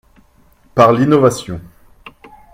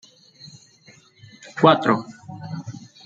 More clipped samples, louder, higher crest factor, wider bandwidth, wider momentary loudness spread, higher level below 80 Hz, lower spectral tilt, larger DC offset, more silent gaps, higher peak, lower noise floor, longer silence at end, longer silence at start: neither; first, -13 LUFS vs -19 LUFS; second, 16 dB vs 22 dB; first, 16 kHz vs 7.8 kHz; second, 18 LU vs 25 LU; first, -46 dBFS vs -66 dBFS; about the same, -6.5 dB/octave vs -6.5 dB/octave; neither; neither; about the same, 0 dBFS vs -2 dBFS; about the same, -50 dBFS vs -52 dBFS; first, 0.85 s vs 0.3 s; second, 0.75 s vs 1.55 s